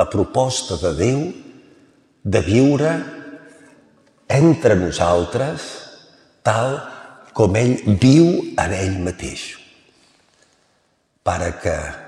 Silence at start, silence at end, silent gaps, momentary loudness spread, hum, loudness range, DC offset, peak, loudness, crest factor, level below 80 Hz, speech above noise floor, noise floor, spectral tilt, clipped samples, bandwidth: 0 s; 0 s; none; 19 LU; none; 4 LU; under 0.1%; -2 dBFS; -18 LUFS; 18 dB; -42 dBFS; 47 dB; -64 dBFS; -6 dB/octave; under 0.1%; 11.5 kHz